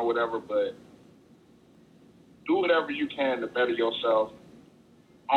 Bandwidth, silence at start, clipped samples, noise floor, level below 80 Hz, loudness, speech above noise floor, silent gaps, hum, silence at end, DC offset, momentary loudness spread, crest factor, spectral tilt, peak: 8.4 kHz; 0 s; under 0.1%; -57 dBFS; -70 dBFS; -27 LUFS; 30 dB; none; none; 0 s; under 0.1%; 10 LU; 20 dB; -5.5 dB/octave; -10 dBFS